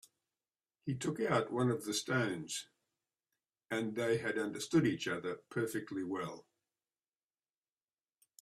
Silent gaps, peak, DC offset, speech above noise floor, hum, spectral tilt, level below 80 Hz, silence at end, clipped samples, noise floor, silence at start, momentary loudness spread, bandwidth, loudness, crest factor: none; -18 dBFS; under 0.1%; over 54 dB; none; -5 dB/octave; -76 dBFS; 2 s; under 0.1%; under -90 dBFS; 0.85 s; 10 LU; 14.5 kHz; -37 LUFS; 20 dB